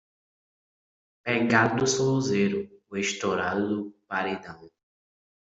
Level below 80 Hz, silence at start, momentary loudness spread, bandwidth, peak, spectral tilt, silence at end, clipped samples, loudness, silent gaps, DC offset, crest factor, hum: -64 dBFS; 1.25 s; 13 LU; 8.2 kHz; -6 dBFS; -4.5 dB/octave; 0.85 s; under 0.1%; -26 LUFS; none; under 0.1%; 22 dB; none